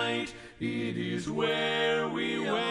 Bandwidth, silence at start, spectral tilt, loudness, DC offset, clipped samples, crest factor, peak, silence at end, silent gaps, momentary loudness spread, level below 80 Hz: 12 kHz; 0 s; -5 dB/octave; -30 LUFS; under 0.1%; under 0.1%; 14 dB; -16 dBFS; 0 s; none; 7 LU; -62 dBFS